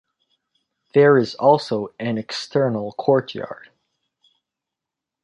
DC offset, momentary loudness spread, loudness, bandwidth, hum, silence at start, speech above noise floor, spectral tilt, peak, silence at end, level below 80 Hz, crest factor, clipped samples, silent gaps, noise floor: under 0.1%; 16 LU; -19 LUFS; 10 kHz; none; 0.95 s; 67 dB; -6.5 dB/octave; -2 dBFS; 1.7 s; -66 dBFS; 20 dB; under 0.1%; none; -85 dBFS